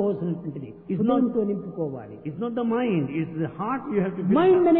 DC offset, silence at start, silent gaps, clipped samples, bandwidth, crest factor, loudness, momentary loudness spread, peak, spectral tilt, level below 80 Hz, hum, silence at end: under 0.1%; 0 s; none; under 0.1%; 4 kHz; 14 dB; -25 LUFS; 11 LU; -10 dBFS; -12 dB/octave; -60 dBFS; none; 0 s